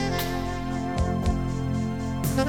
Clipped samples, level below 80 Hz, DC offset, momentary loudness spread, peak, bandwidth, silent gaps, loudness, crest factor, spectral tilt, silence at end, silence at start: under 0.1%; -34 dBFS; under 0.1%; 4 LU; -10 dBFS; 18 kHz; none; -28 LUFS; 16 dB; -6 dB/octave; 0 s; 0 s